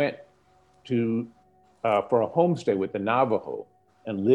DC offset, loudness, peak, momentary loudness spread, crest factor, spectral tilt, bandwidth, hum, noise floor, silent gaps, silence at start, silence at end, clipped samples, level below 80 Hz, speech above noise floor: under 0.1%; -26 LUFS; -8 dBFS; 15 LU; 18 dB; -8 dB/octave; 9.6 kHz; none; -61 dBFS; none; 0 s; 0 s; under 0.1%; -70 dBFS; 37 dB